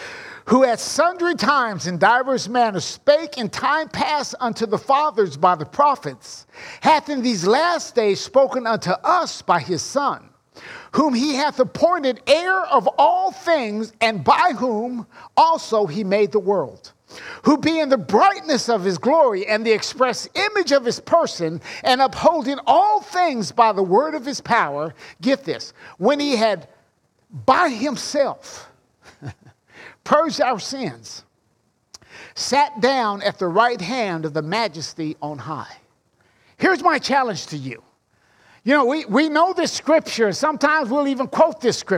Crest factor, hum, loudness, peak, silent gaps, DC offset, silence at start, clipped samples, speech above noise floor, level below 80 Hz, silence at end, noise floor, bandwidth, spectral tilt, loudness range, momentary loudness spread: 18 dB; none; -19 LUFS; -2 dBFS; none; under 0.1%; 0 s; under 0.1%; 46 dB; -62 dBFS; 0 s; -65 dBFS; 14.5 kHz; -4 dB/octave; 5 LU; 13 LU